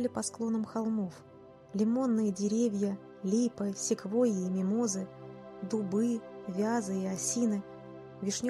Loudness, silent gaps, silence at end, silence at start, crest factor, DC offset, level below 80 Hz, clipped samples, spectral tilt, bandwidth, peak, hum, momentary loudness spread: -32 LUFS; none; 0 s; 0 s; 14 dB; under 0.1%; -72 dBFS; under 0.1%; -5.5 dB/octave; 12.5 kHz; -18 dBFS; none; 12 LU